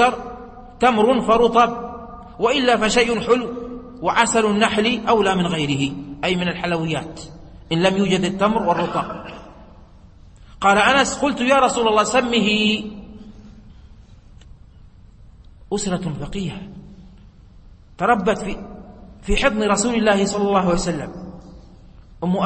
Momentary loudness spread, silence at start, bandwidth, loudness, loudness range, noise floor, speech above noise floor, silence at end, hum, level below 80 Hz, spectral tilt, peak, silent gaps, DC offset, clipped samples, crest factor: 19 LU; 0 s; 8.8 kHz; -19 LUFS; 12 LU; -45 dBFS; 27 dB; 0 s; none; -40 dBFS; -4.5 dB/octave; -2 dBFS; none; under 0.1%; under 0.1%; 20 dB